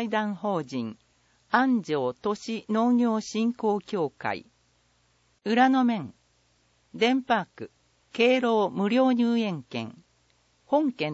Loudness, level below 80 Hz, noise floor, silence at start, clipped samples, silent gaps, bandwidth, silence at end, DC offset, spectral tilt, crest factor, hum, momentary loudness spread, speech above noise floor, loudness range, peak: -26 LUFS; -72 dBFS; -67 dBFS; 0 s; under 0.1%; none; 8 kHz; 0 s; under 0.1%; -5.5 dB/octave; 20 dB; none; 15 LU; 42 dB; 3 LU; -8 dBFS